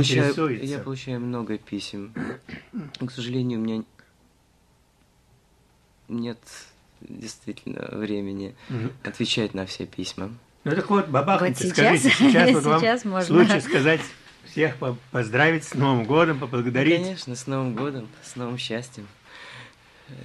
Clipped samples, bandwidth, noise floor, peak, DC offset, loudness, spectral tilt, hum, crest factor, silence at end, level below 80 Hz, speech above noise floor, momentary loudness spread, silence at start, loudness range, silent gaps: under 0.1%; 13 kHz; -61 dBFS; -6 dBFS; under 0.1%; -23 LUFS; -5 dB/octave; none; 18 dB; 0 s; -62 dBFS; 38 dB; 20 LU; 0 s; 16 LU; none